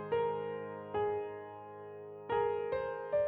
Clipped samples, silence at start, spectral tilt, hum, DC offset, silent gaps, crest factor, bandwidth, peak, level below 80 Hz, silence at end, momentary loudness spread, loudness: under 0.1%; 0 s; -8.5 dB/octave; none; under 0.1%; none; 14 dB; 4.6 kHz; -22 dBFS; -68 dBFS; 0 s; 14 LU; -37 LUFS